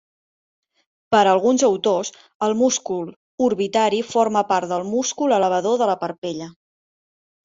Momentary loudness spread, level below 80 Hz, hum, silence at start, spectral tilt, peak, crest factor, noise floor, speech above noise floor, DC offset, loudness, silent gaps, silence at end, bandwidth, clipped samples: 12 LU; -66 dBFS; none; 1.1 s; -3.5 dB/octave; -2 dBFS; 18 dB; under -90 dBFS; over 71 dB; under 0.1%; -20 LUFS; 2.35-2.40 s, 3.16-3.38 s, 6.18-6.22 s; 0.95 s; 7.8 kHz; under 0.1%